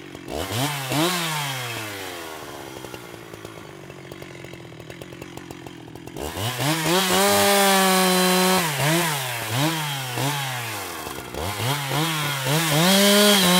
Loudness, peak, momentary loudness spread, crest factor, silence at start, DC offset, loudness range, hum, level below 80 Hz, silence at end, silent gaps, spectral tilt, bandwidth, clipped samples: -20 LUFS; -4 dBFS; 22 LU; 18 dB; 0 s; under 0.1%; 19 LU; none; -54 dBFS; 0 s; none; -3 dB/octave; 16.5 kHz; under 0.1%